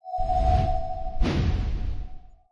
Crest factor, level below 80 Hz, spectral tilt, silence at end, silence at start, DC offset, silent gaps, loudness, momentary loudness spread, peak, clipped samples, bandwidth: 14 dB; -28 dBFS; -7.5 dB/octave; 0.2 s; 0.05 s; under 0.1%; none; -27 LUFS; 12 LU; -10 dBFS; under 0.1%; 7.2 kHz